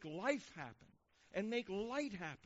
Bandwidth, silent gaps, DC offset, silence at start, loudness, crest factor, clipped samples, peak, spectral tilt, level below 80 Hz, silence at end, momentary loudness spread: 8 kHz; none; under 0.1%; 0 s; -43 LUFS; 22 dB; under 0.1%; -22 dBFS; -3.5 dB/octave; -74 dBFS; 0.1 s; 12 LU